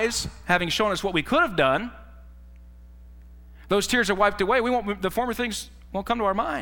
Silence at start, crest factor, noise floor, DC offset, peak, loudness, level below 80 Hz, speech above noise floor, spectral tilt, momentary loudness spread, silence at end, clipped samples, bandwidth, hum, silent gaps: 0 s; 20 dB; -46 dBFS; under 0.1%; -6 dBFS; -24 LUFS; -44 dBFS; 22 dB; -3.5 dB/octave; 8 LU; 0 s; under 0.1%; 18 kHz; 60 Hz at -45 dBFS; none